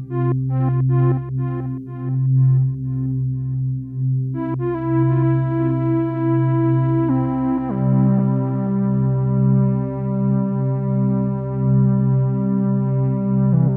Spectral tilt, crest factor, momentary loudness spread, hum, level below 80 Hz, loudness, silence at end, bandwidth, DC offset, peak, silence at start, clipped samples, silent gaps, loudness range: -13.5 dB/octave; 12 dB; 7 LU; none; -46 dBFS; -19 LUFS; 0 s; 2.6 kHz; under 0.1%; -6 dBFS; 0 s; under 0.1%; none; 2 LU